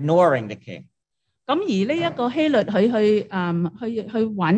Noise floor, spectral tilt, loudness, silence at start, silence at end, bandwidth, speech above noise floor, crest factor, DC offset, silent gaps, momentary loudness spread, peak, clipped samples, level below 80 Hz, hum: -79 dBFS; -7.5 dB/octave; -21 LUFS; 0 s; 0 s; 9 kHz; 59 dB; 16 dB; under 0.1%; none; 16 LU; -4 dBFS; under 0.1%; -66 dBFS; none